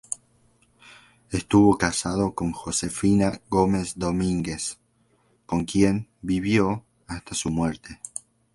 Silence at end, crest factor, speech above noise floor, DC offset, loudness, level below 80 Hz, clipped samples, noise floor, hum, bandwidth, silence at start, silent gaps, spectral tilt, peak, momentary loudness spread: 0.45 s; 22 dB; 41 dB; under 0.1%; -24 LUFS; -46 dBFS; under 0.1%; -65 dBFS; none; 11.5 kHz; 0.1 s; none; -5 dB/octave; -4 dBFS; 16 LU